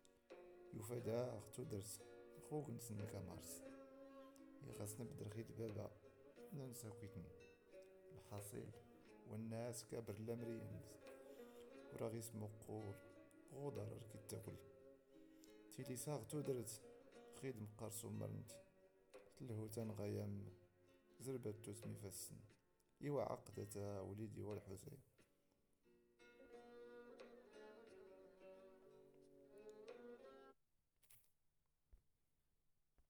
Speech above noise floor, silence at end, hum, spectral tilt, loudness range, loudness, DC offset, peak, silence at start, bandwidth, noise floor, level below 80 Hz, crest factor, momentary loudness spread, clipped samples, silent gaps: 34 dB; 0.1 s; none; -6 dB/octave; 13 LU; -53 LUFS; under 0.1%; -34 dBFS; 0 s; over 20 kHz; -85 dBFS; -80 dBFS; 20 dB; 17 LU; under 0.1%; none